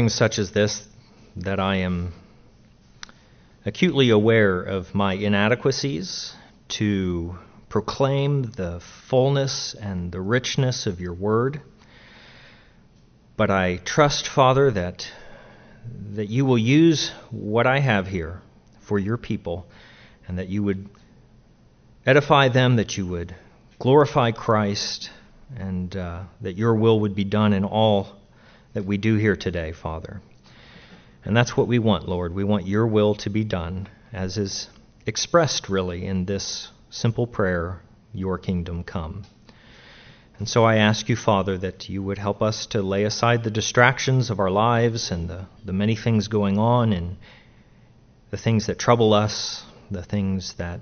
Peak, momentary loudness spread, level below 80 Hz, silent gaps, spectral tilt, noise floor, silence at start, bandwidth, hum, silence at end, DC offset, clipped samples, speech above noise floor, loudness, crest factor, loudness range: 0 dBFS; 17 LU; -48 dBFS; none; -5 dB/octave; -54 dBFS; 0 s; 6.6 kHz; none; 0 s; under 0.1%; under 0.1%; 32 dB; -22 LUFS; 22 dB; 6 LU